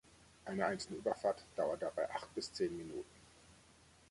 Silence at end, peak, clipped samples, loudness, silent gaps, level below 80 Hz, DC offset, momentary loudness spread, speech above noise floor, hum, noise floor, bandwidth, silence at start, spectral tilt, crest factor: 0.55 s; -22 dBFS; under 0.1%; -41 LUFS; none; -70 dBFS; under 0.1%; 11 LU; 25 dB; none; -65 dBFS; 11.5 kHz; 0.2 s; -4.5 dB/octave; 20 dB